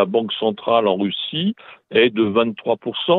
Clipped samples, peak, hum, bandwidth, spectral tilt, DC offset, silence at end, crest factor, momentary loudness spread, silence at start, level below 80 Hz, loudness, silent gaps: under 0.1%; -2 dBFS; none; 4.3 kHz; -9 dB/octave; under 0.1%; 0 s; 18 dB; 7 LU; 0 s; -64 dBFS; -19 LUFS; none